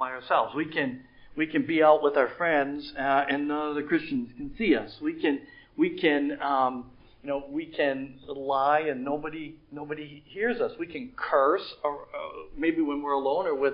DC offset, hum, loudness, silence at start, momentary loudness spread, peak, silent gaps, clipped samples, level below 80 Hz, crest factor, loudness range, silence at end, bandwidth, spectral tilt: under 0.1%; none; -27 LUFS; 0 s; 14 LU; -8 dBFS; none; under 0.1%; -60 dBFS; 20 dB; 5 LU; 0 s; 5.4 kHz; -9.5 dB/octave